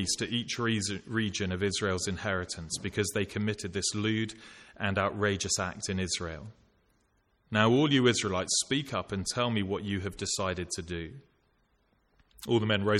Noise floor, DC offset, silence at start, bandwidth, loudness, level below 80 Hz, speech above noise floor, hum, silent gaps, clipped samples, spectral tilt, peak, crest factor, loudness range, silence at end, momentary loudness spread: -71 dBFS; under 0.1%; 0 s; 15.5 kHz; -30 LUFS; -58 dBFS; 41 dB; none; none; under 0.1%; -4 dB/octave; -8 dBFS; 22 dB; 5 LU; 0 s; 10 LU